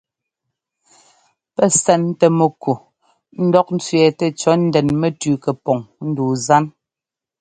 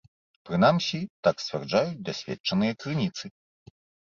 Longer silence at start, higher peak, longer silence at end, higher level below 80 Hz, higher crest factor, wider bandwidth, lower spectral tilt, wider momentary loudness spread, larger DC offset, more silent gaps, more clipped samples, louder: first, 1.6 s vs 0.45 s; first, 0 dBFS vs -8 dBFS; second, 0.7 s vs 0.85 s; first, -56 dBFS vs -62 dBFS; about the same, 18 dB vs 20 dB; first, 9.6 kHz vs 7.4 kHz; about the same, -5.5 dB/octave vs -6 dB/octave; about the same, 9 LU vs 11 LU; neither; second, none vs 1.10-1.23 s, 2.40-2.44 s; neither; first, -17 LUFS vs -27 LUFS